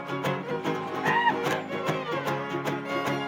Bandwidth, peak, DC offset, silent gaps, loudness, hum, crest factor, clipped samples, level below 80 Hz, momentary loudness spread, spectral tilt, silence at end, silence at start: 17 kHz; -10 dBFS; under 0.1%; none; -28 LUFS; none; 18 dB; under 0.1%; -72 dBFS; 7 LU; -5.5 dB/octave; 0 s; 0 s